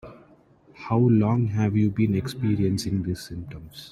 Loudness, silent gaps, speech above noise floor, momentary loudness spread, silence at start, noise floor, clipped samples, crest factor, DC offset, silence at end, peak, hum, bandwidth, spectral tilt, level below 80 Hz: -24 LUFS; none; 32 dB; 17 LU; 0.05 s; -55 dBFS; under 0.1%; 16 dB; under 0.1%; 0.05 s; -8 dBFS; none; 13.5 kHz; -7.5 dB/octave; -52 dBFS